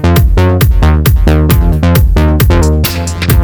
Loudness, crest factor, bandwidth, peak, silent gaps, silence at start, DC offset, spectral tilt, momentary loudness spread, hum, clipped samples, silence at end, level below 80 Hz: -9 LUFS; 8 dB; over 20 kHz; 0 dBFS; none; 0 s; under 0.1%; -6 dB/octave; 3 LU; none; 0.2%; 0 s; -10 dBFS